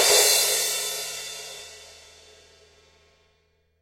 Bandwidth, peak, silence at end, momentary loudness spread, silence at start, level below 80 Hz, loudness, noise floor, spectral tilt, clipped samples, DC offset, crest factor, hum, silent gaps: 16 kHz; -4 dBFS; 1.9 s; 24 LU; 0 s; -64 dBFS; -21 LUFS; -67 dBFS; 2 dB/octave; under 0.1%; under 0.1%; 22 dB; none; none